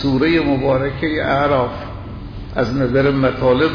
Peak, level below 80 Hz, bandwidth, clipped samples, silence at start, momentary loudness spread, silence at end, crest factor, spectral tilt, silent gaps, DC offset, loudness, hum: -6 dBFS; -34 dBFS; 5.4 kHz; under 0.1%; 0 s; 15 LU; 0 s; 12 dB; -8 dB/octave; none; under 0.1%; -17 LUFS; none